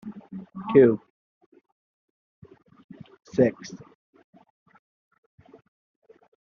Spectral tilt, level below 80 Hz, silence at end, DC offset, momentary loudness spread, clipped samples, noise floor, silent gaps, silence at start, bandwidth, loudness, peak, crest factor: -7.5 dB/octave; -68 dBFS; 2.7 s; under 0.1%; 24 LU; under 0.1%; -40 dBFS; 1.10-1.52 s, 1.72-2.42 s, 2.84-2.89 s; 0.05 s; 6.8 kHz; -22 LUFS; -4 dBFS; 24 dB